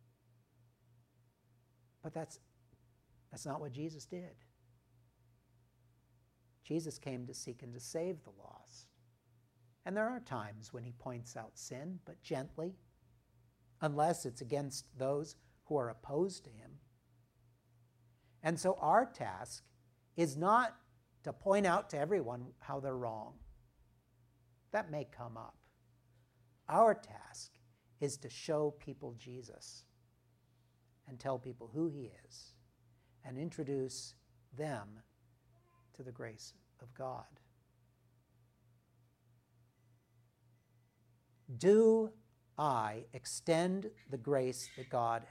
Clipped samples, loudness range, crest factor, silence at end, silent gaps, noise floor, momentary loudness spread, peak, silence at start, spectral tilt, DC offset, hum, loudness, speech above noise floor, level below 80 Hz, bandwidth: under 0.1%; 15 LU; 24 dB; 0 s; none; -73 dBFS; 21 LU; -16 dBFS; 2.05 s; -5.5 dB/octave; under 0.1%; none; -38 LUFS; 35 dB; -74 dBFS; 15.5 kHz